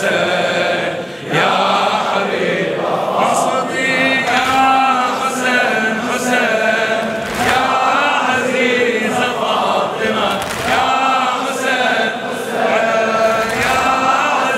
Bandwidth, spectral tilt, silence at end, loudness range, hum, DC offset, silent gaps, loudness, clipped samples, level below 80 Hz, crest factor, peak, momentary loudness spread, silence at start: 16 kHz; -3.5 dB/octave; 0 s; 2 LU; none; under 0.1%; none; -15 LUFS; under 0.1%; -50 dBFS; 16 dB; 0 dBFS; 4 LU; 0 s